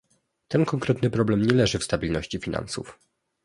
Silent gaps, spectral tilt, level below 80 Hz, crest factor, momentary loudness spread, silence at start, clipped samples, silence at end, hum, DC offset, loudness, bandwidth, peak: none; -6 dB/octave; -46 dBFS; 22 dB; 11 LU; 0.5 s; under 0.1%; 0.5 s; none; under 0.1%; -25 LUFS; 11.5 kHz; -2 dBFS